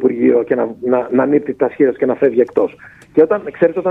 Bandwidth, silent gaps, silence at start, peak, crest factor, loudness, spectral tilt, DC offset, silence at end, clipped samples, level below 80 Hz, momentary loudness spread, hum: 3.9 kHz; none; 0 s; 0 dBFS; 14 dB; -15 LUFS; -9.5 dB/octave; under 0.1%; 0 s; under 0.1%; -58 dBFS; 5 LU; none